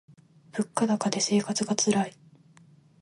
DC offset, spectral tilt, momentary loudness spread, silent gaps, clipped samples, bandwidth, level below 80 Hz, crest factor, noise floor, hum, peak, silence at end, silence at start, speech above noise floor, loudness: under 0.1%; -4 dB/octave; 9 LU; none; under 0.1%; 11.5 kHz; -72 dBFS; 22 dB; -57 dBFS; none; -8 dBFS; 0.9 s; 0.55 s; 31 dB; -27 LUFS